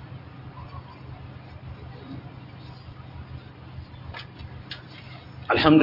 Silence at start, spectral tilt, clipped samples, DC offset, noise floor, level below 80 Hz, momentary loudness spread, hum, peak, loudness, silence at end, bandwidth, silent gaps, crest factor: 0 s; -8.5 dB/octave; under 0.1%; under 0.1%; -43 dBFS; -52 dBFS; 8 LU; none; -4 dBFS; -32 LUFS; 0 s; 5.8 kHz; none; 24 dB